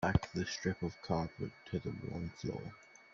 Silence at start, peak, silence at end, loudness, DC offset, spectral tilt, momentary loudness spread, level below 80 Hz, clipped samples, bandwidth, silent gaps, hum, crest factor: 0 s; -16 dBFS; 0.1 s; -40 LUFS; under 0.1%; -5.5 dB/octave; 10 LU; -54 dBFS; under 0.1%; 7.4 kHz; none; none; 24 dB